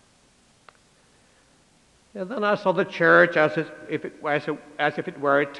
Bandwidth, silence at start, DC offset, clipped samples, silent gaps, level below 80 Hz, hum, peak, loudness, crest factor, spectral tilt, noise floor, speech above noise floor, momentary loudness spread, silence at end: 10.5 kHz; 2.15 s; under 0.1%; under 0.1%; none; -70 dBFS; none; -4 dBFS; -23 LUFS; 20 dB; -6.5 dB/octave; -59 dBFS; 37 dB; 16 LU; 0 s